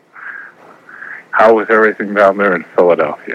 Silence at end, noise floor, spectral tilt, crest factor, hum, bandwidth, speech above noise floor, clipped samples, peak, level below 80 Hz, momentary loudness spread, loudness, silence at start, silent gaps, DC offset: 0 s; -39 dBFS; -7 dB/octave; 14 dB; none; 8.4 kHz; 27 dB; 0.3%; 0 dBFS; -60 dBFS; 20 LU; -12 LUFS; 0.15 s; none; under 0.1%